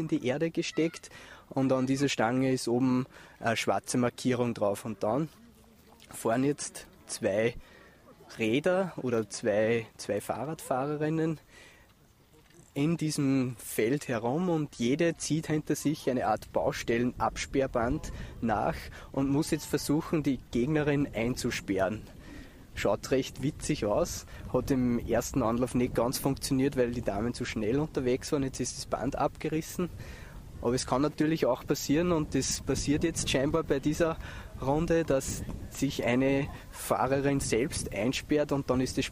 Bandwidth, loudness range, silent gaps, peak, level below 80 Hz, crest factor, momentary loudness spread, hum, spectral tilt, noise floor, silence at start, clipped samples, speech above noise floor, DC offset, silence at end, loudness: 15.5 kHz; 3 LU; none; -12 dBFS; -48 dBFS; 18 dB; 9 LU; none; -5 dB/octave; -61 dBFS; 0 s; under 0.1%; 31 dB; under 0.1%; 0 s; -30 LUFS